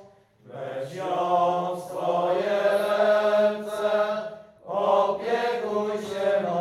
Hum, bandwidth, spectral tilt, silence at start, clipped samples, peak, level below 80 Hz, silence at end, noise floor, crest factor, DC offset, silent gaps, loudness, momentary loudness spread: none; 13 kHz; -5 dB/octave; 0 s; under 0.1%; -10 dBFS; -74 dBFS; 0 s; -52 dBFS; 16 dB; under 0.1%; none; -25 LUFS; 12 LU